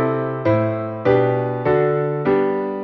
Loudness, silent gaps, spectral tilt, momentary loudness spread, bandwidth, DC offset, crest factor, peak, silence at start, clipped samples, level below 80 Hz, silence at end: -19 LUFS; none; -10 dB/octave; 4 LU; 5.8 kHz; under 0.1%; 16 dB; -4 dBFS; 0 s; under 0.1%; -52 dBFS; 0 s